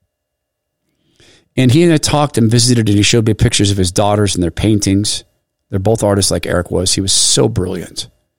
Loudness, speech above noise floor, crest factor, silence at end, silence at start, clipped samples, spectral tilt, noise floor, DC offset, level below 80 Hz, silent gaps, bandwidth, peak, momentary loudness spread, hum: -13 LUFS; 62 dB; 12 dB; 0 s; 0 s; under 0.1%; -4.5 dB/octave; -74 dBFS; 2%; -34 dBFS; none; 16.5 kHz; -2 dBFS; 10 LU; none